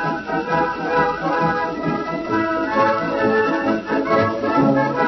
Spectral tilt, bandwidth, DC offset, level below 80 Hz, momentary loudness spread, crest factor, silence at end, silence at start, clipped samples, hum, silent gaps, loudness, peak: -7 dB/octave; 6.2 kHz; under 0.1%; -50 dBFS; 5 LU; 14 dB; 0 s; 0 s; under 0.1%; none; none; -19 LUFS; -4 dBFS